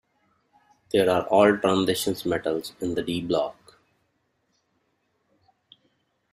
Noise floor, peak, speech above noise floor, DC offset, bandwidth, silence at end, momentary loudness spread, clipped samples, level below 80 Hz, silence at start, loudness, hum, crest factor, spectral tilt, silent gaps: -72 dBFS; -6 dBFS; 49 dB; under 0.1%; 15.5 kHz; 2.8 s; 10 LU; under 0.1%; -62 dBFS; 0.95 s; -24 LUFS; none; 22 dB; -5 dB/octave; none